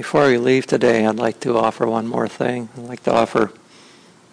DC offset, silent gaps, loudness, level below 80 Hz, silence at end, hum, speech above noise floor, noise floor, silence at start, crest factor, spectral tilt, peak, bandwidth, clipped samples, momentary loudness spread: under 0.1%; none; -18 LUFS; -58 dBFS; 0.8 s; none; 30 dB; -48 dBFS; 0 s; 14 dB; -6 dB/octave; -4 dBFS; 10.5 kHz; under 0.1%; 9 LU